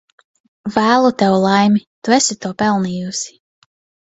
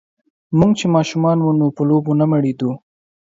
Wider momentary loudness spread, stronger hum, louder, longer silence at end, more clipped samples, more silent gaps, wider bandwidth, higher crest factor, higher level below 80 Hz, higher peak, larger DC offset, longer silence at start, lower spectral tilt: first, 11 LU vs 7 LU; neither; about the same, -15 LUFS vs -16 LUFS; first, 0.75 s vs 0.55 s; neither; first, 1.87-2.02 s vs none; about the same, 8.2 kHz vs 7.8 kHz; about the same, 16 dB vs 16 dB; about the same, -56 dBFS vs -52 dBFS; about the same, 0 dBFS vs 0 dBFS; neither; first, 0.65 s vs 0.5 s; second, -4.5 dB/octave vs -7.5 dB/octave